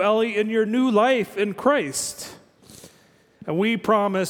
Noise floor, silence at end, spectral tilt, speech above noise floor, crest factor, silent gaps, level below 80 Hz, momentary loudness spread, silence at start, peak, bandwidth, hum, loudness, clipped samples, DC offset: -56 dBFS; 0 s; -4.5 dB/octave; 35 dB; 18 dB; none; -66 dBFS; 11 LU; 0 s; -4 dBFS; 18.5 kHz; none; -22 LUFS; under 0.1%; under 0.1%